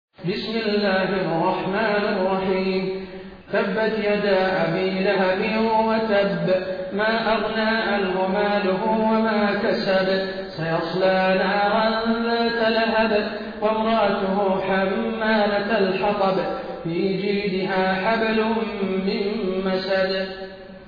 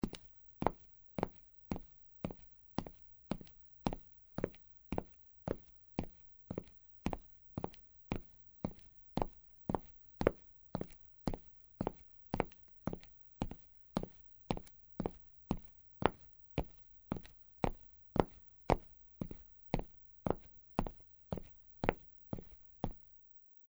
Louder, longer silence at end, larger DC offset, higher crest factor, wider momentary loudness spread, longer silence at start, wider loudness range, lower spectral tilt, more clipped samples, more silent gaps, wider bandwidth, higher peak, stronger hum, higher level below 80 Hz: first, -22 LUFS vs -44 LUFS; second, 0 s vs 0.3 s; neither; second, 12 dB vs 36 dB; second, 6 LU vs 19 LU; first, 0.2 s vs 0.05 s; second, 2 LU vs 5 LU; about the same, -8 dB/octave vs -7.5 dB/octave; neither; neither; second, 5.2 kHz vs over 20 kHz; about the same, -10 dBFS vs -8 dBFS; neither; about the same, -52 dBFS vs -52 dBFS